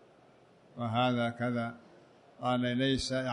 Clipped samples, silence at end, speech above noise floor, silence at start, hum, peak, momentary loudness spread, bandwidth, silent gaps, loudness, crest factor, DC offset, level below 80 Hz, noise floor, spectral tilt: under 0.1%; 0 s; 30 dB; 0.75 s; none; -16 dBFS; 11 LU; 11 kHz; none; -32 LUFS; 16 dB; under 0.1%; -60 dBFS; -61 dBFS; -5.5 dB/octave